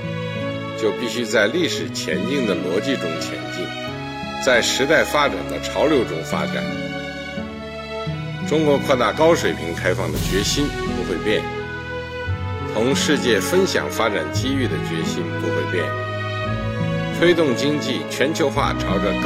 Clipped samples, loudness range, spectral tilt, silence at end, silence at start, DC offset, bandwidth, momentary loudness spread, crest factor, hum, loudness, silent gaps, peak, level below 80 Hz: under 0.1%; 3 LU; -4.5 dB/octave; 0 s; 0 s; under 0.1%; 17 kHz; 11 LU; 16 dB; none; -21 LUFS; none; -4 dBFS; -40 dBFS